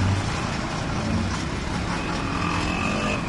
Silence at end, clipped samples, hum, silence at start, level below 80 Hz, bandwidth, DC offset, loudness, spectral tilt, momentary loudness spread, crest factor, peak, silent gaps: 0 s; under 0.1%; none; 0 s; -36 dBFS; 11.5 kHz; under 0.1%; -26 LUFS; -5 dB/octave; 3 LU; 14 dB; -10 dBFS; none